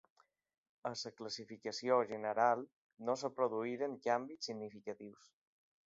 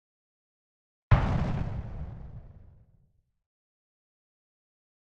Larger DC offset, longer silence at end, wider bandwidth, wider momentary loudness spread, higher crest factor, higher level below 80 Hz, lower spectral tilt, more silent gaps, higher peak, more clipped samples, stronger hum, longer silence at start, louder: neither; second, 0.75 s vs 2.35 s; about the same, 7.6 kHz vs 7.4 kHz; second, 14 LU vs 21 LU; about the same, 22 dB vs 26 dB; second, -86 dBFS vs -40 dBFS; second, -3 dB/octave vs -8.5 dB/octave; first, 2.73-2.90 s vs none; second, -18 dBFS vs -6 dBFS; neither; neither; second, 0.85 s vs 1.1 s; second, -39 LUFS vs -30 LUFS